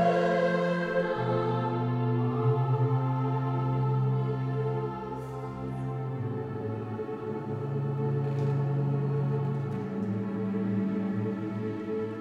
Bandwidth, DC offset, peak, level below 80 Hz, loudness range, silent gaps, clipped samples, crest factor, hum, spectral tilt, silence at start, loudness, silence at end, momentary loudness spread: 6.2 kHz; under 0.1%; -14 dBFS; -60 dBFS; 6 LU; none; under 0.1%; 16 dB; none; -9 dB/octave; 0 s; -30 LUFS; 0 s; 8 LU